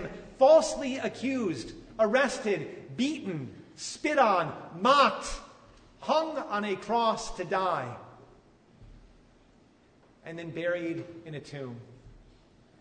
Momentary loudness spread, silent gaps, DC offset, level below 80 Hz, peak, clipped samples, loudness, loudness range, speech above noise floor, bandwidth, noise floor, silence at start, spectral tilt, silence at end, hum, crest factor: 19 LU; none; under 0.1%; -56 dBFS; -8 dBFS; under 0.1%; -28 LUFS; 12 LU; 33 dB; 9.6 kHz; -61 dBFS; 0 s; -4.5 dB/octave; 0.65 s; none; 22 dB